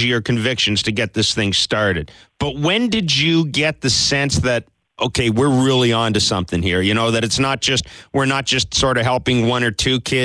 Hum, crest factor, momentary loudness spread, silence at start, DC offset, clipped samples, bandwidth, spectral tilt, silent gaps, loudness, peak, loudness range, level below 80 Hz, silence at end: none; 14 dB; 6 LU; 0 s; under 0.1%; under 0.1%; 11 kHz; -4 dB/octave; none; -17 LUFS; -2 dBFS; 1 LU; -40 dBFS; 0 s